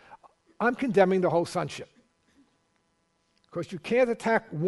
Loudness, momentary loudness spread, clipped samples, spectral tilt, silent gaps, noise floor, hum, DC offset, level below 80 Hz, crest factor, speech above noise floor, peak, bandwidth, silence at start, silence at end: -26 LUFS; 14 LU; under 0.1%; -6.5 dB/octave; none; -72 dBFS; none; under 0.1%; -66 dBFS; 22 dB; 46 dB; -8 dBFS; 11.5 kHz; 0.1 s; 0 s